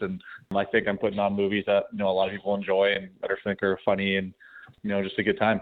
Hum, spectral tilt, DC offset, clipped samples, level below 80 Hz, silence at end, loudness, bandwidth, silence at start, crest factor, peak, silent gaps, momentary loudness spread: none; -8.5 dB/octave; under 0.1%; under 0.1%; -60 dBFS; 0 s; -26 LUFS; 4.6 kHz; 0 s; 18 dB; -8 dBFS; none; 7 LU